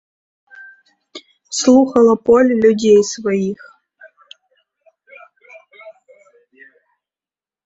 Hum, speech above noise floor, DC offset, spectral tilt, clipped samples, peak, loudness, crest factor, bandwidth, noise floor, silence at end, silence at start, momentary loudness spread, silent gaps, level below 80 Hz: none; over 77 dB; under 0.1%; -4.5 dB/octave; under 0.1%; 0 dBFS; -13 LUFS; 18 dB; 8.2 kHz; under -90 dBFS; 1.75 s; 1.15 s; 27 LU; none; -58 dBFS